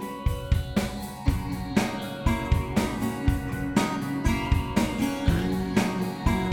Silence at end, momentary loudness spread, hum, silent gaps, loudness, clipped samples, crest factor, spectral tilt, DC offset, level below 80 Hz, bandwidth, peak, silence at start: 0 s; 4 LU; none; none; -27 LUFS; under 0.1%; 18 dB; -6 dB/octave; under 0.1%; -32 dBFS; 18.5 kHz; -8 dBFS; 0 s